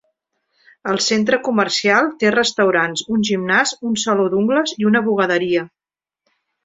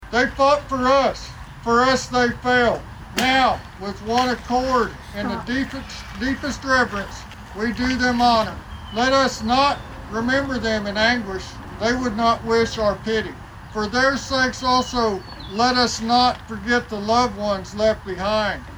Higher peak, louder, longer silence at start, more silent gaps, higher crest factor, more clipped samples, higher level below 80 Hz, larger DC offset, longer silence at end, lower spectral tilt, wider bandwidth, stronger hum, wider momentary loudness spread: about the same, -2 dBFS vs -4 dBFS; first, -17 LUFS vs -20 LUFS; first, 0.85 s vs 0 s; neither; about the same, 16 dB vs 18 dB; neither; second, -60 dBFS vs -40 dBFS; neither; first, 0.95 s vs 0 s; about the same, -3.5 dB/octave vs -4 dB/octave; second, 8 kHz vs over 20 kHz; neither; second, 5 LU vs 13 LU